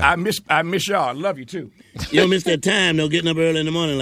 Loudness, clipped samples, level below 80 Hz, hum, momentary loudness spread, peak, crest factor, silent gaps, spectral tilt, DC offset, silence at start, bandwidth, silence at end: -19 LUFS; under 0.1%; -44 dBFS; none; 14 LU; 0 dBFS; 20 dB; none; -4.5 dB/octave; under 0.1%; 0 s; 16 kHz; 0 s